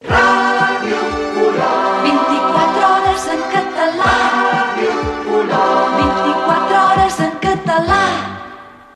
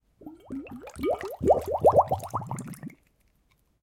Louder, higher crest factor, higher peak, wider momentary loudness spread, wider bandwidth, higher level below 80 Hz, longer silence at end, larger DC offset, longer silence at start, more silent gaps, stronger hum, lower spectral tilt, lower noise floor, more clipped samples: first, -14 LUFS vs -26 LUFS; second, 12 dB vs 20 dB; first, -2 dBFS vs -8 dBFS; second, 6 LU vs 21 LU; second, 13 kHz vs 17 kHz; first, -38 dBFS vs -54 dBFS; second, 0.25 s vs 0.95 s; neither; second, 0.05 s vs 0.2 s; neither; neither; second, -4.5 dB/octave vs -7 dB/octave; second, -36 dBFS vs -68 dBFS; neither